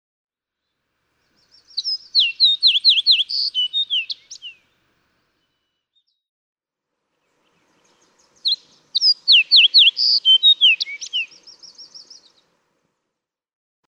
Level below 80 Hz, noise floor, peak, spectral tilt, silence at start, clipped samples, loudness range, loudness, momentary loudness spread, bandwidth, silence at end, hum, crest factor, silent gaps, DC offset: -82 dBFS; -81 dBFS; -4 dBFS; 4.5 dB/octave; 1.75 s; under 0.1%; 15 LU; -14 LUFS; 16 LU; 10 kHz; 1.9 s; none; 16 dB; 6.29-6.53 s; under 0.1%